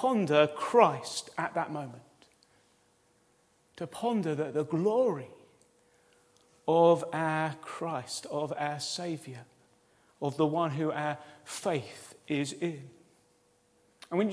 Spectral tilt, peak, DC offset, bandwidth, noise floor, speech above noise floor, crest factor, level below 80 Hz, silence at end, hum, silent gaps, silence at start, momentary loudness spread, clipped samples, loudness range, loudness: -5.5 dB/octave; -8 dBFS; under 0.1%; 11 kHz; -68 dBFS; 38 dB; 24 dB; -80 dBFS; 0 s; none; none; 0 s; 17 LU; under 0.1%; 7 LU; -31 LUFS